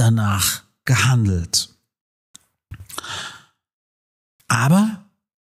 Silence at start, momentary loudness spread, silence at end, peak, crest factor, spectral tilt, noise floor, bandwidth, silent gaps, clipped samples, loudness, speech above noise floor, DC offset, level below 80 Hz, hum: 0 s; 16 LU; 0.45 s; -4 dBFS; 18 dB; -4.5 dB/octave; -42 dBFS; 16 kHz; 2.01-2.34 s, 3.73-4.39 s; under 0.1%; -19 LUFS; 25 dB; under 0.1%; -48 dBFS; none